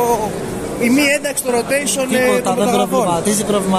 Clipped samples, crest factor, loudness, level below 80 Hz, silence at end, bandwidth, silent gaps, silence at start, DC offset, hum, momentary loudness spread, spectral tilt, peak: under 0.1%; 14 dB; -16 LUFS; -44 dBFS; 0 s; 14.5 kHz; none; 0 s; under 0.1%; none; 5 LU; -4 dB/octave; -2 dBFS